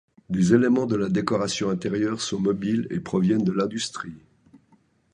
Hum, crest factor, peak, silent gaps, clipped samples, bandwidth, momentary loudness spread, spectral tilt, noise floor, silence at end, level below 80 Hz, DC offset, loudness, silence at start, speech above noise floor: none; 20 dB; -6 dBFS; none; under 0.1%; 10.5 kHz; 10 LU; -6 dB/octave; -62 dBFS; 0.95 s; -56 dBFS; under 0.1%; -24 LUFS; 0.3 s; 39 dB